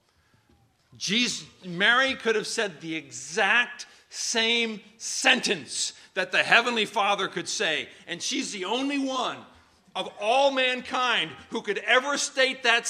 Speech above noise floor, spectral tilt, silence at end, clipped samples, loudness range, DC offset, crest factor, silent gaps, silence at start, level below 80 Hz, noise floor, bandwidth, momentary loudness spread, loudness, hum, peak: 39 dB; -1.5 dB/octave; 0 s; under 0.1%; 3 LU; under 0.1%; 24 dB; none; 1 s; -74 dBFS; -65 dBFS; 15.5 kHz; 13 LU; -25 LUFS; none; -2 dBFS